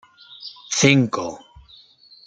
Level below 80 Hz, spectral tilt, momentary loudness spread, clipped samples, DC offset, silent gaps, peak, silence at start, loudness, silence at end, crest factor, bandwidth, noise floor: -54 dBFS; -4 dB/octave; 22 LU; under 0.1%; under 0.1%; none; -2 dBFS; 0.4 s; -18 LUFS; 0.9 s; 22 dB; 9.4 kHz; -50 dBFS